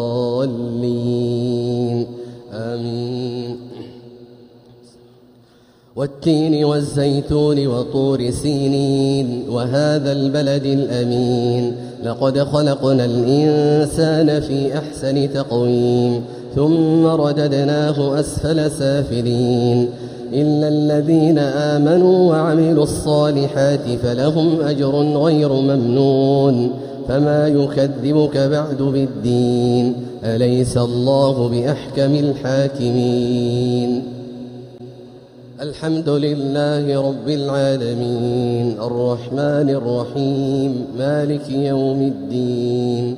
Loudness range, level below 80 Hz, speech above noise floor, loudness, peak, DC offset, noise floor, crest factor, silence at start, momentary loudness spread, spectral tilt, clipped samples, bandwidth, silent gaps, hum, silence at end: 7 LU; -46 dBFS; 34 dB; -17 LUFS; -4 dBFS; under 0.1%; -50 dBFS; 14 dB; 0 s; 9 LU; -7.5 dB/octave; under 0.1%; 14.5 kHz; none; none; 0 s